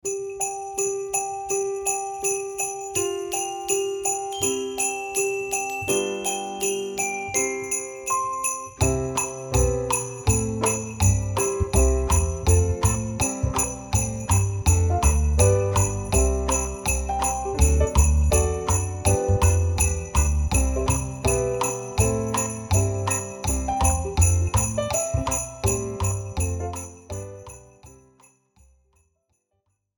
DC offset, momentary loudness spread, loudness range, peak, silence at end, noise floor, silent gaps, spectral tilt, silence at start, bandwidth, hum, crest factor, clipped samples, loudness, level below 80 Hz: under 0.1%; 6 LU; 4 LU; -4 dBFS; 2.1 s; -74 dBFS; none; -4.5 dB/octave; 0.05 s; 19 kHz; none; 20 dB; under 0.1%; -23 LUFS; -30 dBFS